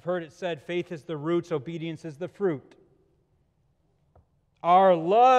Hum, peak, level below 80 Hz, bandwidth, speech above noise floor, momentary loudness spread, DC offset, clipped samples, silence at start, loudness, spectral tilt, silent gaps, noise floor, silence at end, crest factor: none; -8 dBFS; -72 dBFS; 8.8 kHz; 44 dB; 16 LU; under 0.1%; under 0.1%; 0.05 s; -26 LUFS; -7 dB/octave; none; -69 dBFS; 0 s; 18 dB